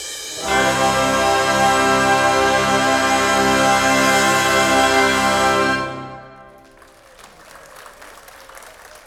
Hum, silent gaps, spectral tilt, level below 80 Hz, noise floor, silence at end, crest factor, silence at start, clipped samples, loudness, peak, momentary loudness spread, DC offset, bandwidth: none; none; -2.5 dB/octave; -44 dBFS; -46 dBFS; 0.1 s; 16 dB; 0 s; under 0.1%; -15 LUFS; -2 dBFS; 6 LU; under 0.1%; 19.5 kHz